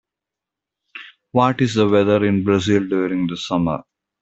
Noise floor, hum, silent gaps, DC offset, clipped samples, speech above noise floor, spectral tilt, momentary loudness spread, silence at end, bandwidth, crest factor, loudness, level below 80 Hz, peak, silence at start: -85 dBFS; none; none; under 0.1%; under 0.1%; 68 dB; -6.5 dB/octave; 21 LU; 0.4 s; 8.2 kHz; 16 dB; -18 LUFS; -54 dBFS; -2 dBFS; 0.95 s